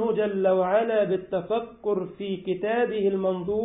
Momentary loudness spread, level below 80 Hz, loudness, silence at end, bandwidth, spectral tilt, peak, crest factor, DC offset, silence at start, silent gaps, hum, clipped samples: 7 LU; -60 dBFS; -26 LUFS; 0 s; 3.9 kHz; -11 dB/octave; -12 dBFS; 14 dB; under 0.1%; 0 s; none; none; under 0.1%